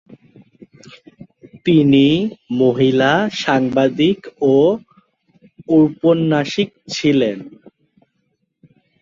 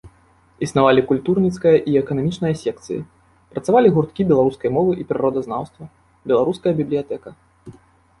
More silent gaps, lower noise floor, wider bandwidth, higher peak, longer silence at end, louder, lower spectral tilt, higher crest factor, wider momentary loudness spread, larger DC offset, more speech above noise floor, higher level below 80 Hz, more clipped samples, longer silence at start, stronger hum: neither; first, -68 dBFS vs -54 dBFS; second, 7.6 kHz vs 11.5 kHz; about the same, -2 dBFS vs -2 dBFS; first, 1.55 s vs 0.5 s; first, -16 LUFS vs -19 LUFS; about the same, -6.5 dB/octave vs -7.5 dB/octave; about the same, 16 dB vs 18 dB; second, 9 LU vs 14 LU; neither; first, 53 dB vs 36 dB; about the same, -56 dBFS vs -52 dBFS; neither; first, 1.55 s vs 0.05 s; neither